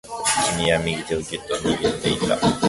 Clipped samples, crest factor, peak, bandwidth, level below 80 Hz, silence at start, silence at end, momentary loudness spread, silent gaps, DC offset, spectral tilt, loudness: under 0.1%; 16 dB; -6 dBFS; 12 kHz; -44 dBFS; 0.05 s; 0 s; 7 LU; none; under 0.1%; -3.5 dB/octave; -22 LUFS